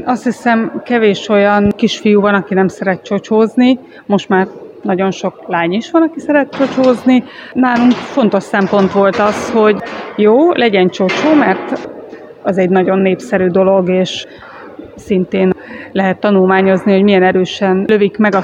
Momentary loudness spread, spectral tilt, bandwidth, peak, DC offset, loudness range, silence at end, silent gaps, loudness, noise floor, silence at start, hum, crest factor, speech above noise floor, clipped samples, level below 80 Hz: 11 LU; -6.5 dB/octave; 9.8 kHz; 0 dBFS; under 0.1%; 3 LU; 0 s; none; -12 LUFS; -32 dBFS; 0 s; none; 12 dB; 20 dB; under 0.1%; -50 dBFS